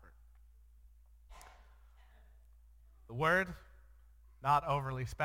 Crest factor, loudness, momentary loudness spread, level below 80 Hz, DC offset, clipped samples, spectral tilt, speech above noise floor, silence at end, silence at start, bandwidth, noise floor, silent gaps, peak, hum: 22 dB; -34 LUFS; 26 LU; -58 dBFS; under 0.1%; under 0.1%; -6 dB/octave; 28 dB; 0 s; 1.3 s; 16.5 kHz; -61 dBFS; none; -16 dBFS; none